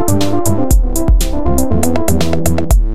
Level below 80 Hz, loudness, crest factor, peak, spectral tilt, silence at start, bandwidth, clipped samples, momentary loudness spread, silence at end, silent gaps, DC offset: -14 dBFS; -14 LUFS; 14 dB; 0 dBFS; -5.5 dB/octave; 0 s; 16 kHz; under 0.1%; 2 LU; 0 s; none; 20%